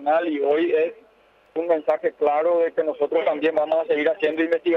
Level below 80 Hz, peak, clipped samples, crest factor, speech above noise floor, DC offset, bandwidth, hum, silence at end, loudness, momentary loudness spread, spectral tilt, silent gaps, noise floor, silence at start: -72 dBFS; -8 dBFS; under 0.1%; 12 dB; 36 dB; under 0.1%; 5.4 kHz; none; 0 s; -22 LUFS; 4 LU; -6.5 dB/octave; none; -57 dBFS; 0 s